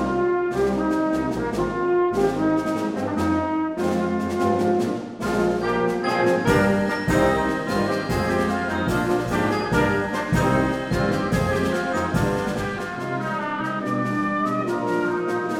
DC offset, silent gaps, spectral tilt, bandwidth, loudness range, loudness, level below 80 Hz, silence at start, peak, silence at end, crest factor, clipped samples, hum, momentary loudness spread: under 0.1%; none; -6.5 dB/octave; 17 kHz; 3 LU; -22 LUFS; -42 dBFS; 0 s; -6 dBFS; 0 s; 16 dB; under 0.1%; none; 5 LU